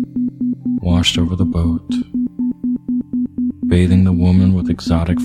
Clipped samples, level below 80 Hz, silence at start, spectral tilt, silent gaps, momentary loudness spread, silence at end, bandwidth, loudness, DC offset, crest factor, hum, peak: under 0.1%; -32 dBFS; 0 s; -6.5 dB/octave; none; 8 LU; 0 s; 11 kHz; -17 LUFS; under 0.1%; 16 dB; none; 0 dBFS